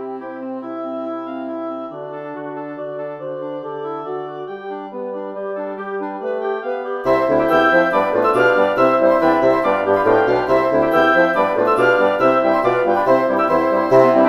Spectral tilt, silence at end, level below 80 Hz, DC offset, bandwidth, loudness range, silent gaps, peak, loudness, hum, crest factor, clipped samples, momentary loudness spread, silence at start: -6.5 dB/octave; 0 s; -52 dBFS; under 0.1%; 13 kHz; 13 LU; none; 0 dBFS; -17 LUFS; none; 16 dB; under 0.1%; 15 LU; 0 s